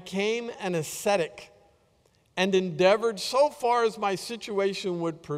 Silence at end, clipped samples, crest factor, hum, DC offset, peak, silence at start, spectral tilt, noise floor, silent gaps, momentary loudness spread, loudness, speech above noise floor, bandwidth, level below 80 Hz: 0 s; under 0.1%; 20 dB; none; under 0.1%; -8 dBFS; 0 s; -4.5 dB/octave; -65 dBFS; none; 9 LU; -27 LUFS; 39 dB; 16 kHz; -68 dBFS